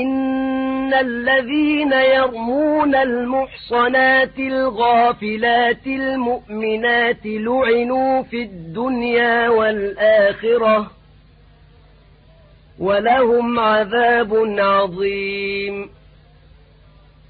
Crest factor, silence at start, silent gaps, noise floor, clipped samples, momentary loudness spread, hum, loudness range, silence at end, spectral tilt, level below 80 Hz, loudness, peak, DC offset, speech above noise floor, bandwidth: 14 dB; 0 s; none; -48 dBFS; under 0.1%; 8 LU; none; 4 LU; 1.4 s; -10 dB/octave; -50 dBFS; -17 LUFS; -4 dBFS; under 0.1%; 31 dB; 4.8 kHz